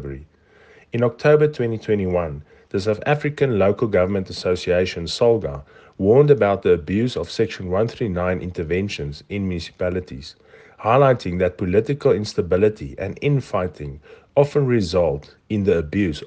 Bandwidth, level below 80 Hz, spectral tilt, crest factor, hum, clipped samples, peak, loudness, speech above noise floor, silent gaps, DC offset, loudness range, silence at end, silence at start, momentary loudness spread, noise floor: 9 kHz; -48 dBFS; -7 dB/octave; 18 dB; none; under 0.1%; -2 dBFS; -20 LUFS; 32 dB; none; under 0.1%; 4 LU; 0 s; 0 s; 13 LU; -52 dBFS